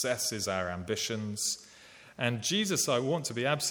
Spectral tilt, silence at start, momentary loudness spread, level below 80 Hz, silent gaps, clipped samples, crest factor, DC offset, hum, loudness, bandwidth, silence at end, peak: -3 dB/octave; 0 s; 6 LU; -68 dBFS; none; under 0.1%; 18 dB; under 0.1%; none; -31 LUFS; 19 kHz; 0 s; -14 dBFS